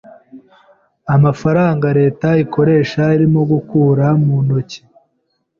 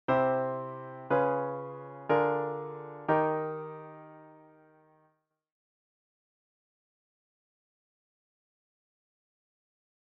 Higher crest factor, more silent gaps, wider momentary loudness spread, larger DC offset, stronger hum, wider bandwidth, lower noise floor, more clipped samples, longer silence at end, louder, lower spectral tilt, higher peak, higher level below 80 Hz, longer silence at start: second, 12 dB vs 22 dB; neither; second, 5 LU vs 16 LU; neither; neither; first, 7 kHz vs 5.4 kHz; second, -67 dBFS vs -74 dBFS; neither; second, 0.8 s vs 5.65 s; first, -14 LUFS vs -31 LUFS; first, -9 dB/octave vs -6 dB/octave; first, -2 dBFS vs -12 dBFS; first, -48 dBFS vs -76 dBFS; first, 0.35 s vs 0.1 s